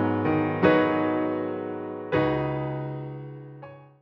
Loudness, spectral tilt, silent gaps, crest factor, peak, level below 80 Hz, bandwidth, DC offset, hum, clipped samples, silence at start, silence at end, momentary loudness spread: -26 LUFS; -9.5 dB/octave; none; 18 dB; -8 dBFS; -56 dBFS; 5.6 kHz; under 0.1%; none; under 0.1%; 0 s; 0.15 s; 20 LU